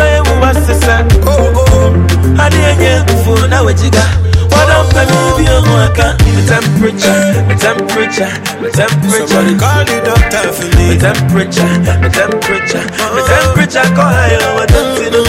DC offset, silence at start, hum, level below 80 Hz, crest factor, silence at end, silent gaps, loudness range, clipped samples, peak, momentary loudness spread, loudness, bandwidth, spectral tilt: under 0.1%; 0 s; none; -16 dBFS; 8 dB; 0 s; none; 2 LU; 0.1%; 0 dBFS; 4 LU; -9 LUFS; 16 kHz; -5 dB/octave